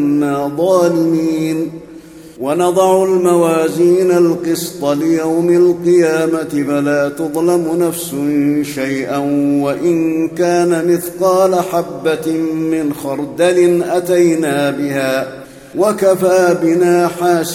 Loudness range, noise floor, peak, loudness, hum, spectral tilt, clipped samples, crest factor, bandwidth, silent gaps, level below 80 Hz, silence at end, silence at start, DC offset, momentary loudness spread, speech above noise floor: 3 LU; -35 dBFS; 0 dBFS; -14 LUFS; none; -6 dB/octave; under 0.1%; 14 dB; 16.5 kHz; none; -54 dBFS; 0 s; 0 s; under 0.1%; 7 LU; 22 dB